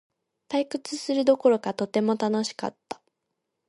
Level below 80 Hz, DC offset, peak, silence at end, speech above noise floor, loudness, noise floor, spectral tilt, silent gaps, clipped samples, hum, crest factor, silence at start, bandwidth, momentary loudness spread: -76 dBFS; under 0.1%; -8 dBFS; 0.75 s; 56 dB; -26 LUFS; -81 dBFS; -5 dB/octave; none; under 0.1%; none; 18 dB; 0.5 s; 11.5 kHz; 16 LU